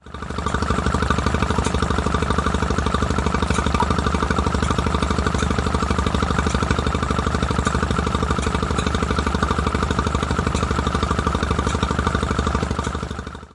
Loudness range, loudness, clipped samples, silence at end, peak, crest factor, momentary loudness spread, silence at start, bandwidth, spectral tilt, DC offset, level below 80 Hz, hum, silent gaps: 1 LU; -21 LUFS; under 0.1%; 0.05 s; -2 dBFS; 18 dB; 1 LU; 0.05 s; 11.5 kHz; -5.5 dB/octave; under 0.1%; -26 dBFS; 50 Hz at -30 dBFS; none